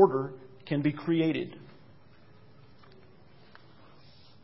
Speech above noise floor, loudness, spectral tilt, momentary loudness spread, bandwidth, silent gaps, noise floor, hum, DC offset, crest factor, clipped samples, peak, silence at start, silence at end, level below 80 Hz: 31 dB; -30 LUFS; -11 dB/octave; 22 LU; 5.8 kHz; none; -58 dBFS; none; 0.2%; 24 dB; under 0.1%; -8 dBFS; 0 s; 2.85 s; -70 dBFS